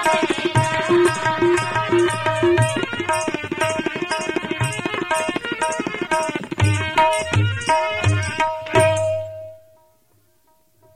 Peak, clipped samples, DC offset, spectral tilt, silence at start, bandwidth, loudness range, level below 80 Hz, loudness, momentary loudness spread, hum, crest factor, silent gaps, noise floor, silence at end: -4 dBFS; under 0.1%; under 0.1%; -5 dB/octave; 0 s; 14 kHz; 4 LU; -48 dBFS; -20 LUFS; 7 LU; none; 16 dB; none; -61 dBFS; 1.4 s